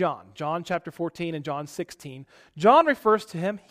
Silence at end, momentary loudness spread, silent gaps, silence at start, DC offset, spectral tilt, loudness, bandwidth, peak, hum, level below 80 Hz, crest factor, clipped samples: 0.15 s; 18 LU; none; 0 s; under 0.1%; -6 dB/octave; -24 LUFS; 15.5 kHz; -4 dBFS; none; -66 dBFS; 20 dB; under 0.1%